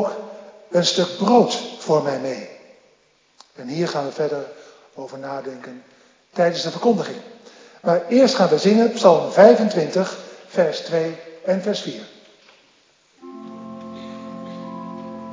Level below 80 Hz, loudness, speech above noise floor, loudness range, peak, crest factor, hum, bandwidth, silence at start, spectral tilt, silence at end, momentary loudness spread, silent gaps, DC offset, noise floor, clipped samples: -74 dBFS; -19 LUFS; 41 dB; 13 LU; 0 dBFS; 20 dB; none; 7.6 kHz; 0 s; -5 dB/octave; 0 s; 22 LU; none; under 0.1%; -59 dBFS; under 0.1%